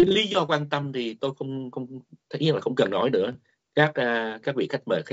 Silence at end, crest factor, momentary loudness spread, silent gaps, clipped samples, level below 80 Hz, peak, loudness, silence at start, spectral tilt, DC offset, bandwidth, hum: 0 s; 20 dB; 14 LU; none; under 0.1%; -66 dBFS; -6 dBFS; -26 LUFS; 0 s; -3.5 dB/octave; under 0.1%; 8 kHz; none